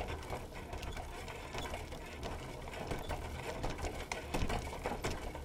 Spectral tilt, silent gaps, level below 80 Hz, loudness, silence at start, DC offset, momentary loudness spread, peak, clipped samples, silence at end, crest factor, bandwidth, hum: -4.5 dB/octave; none; -46 dBFS; -43 LUFS; 0 s; under 0.1%; 6 LU; -22 dBFS; under 0.1%; 0 s; 20 dB; 17 kHz; none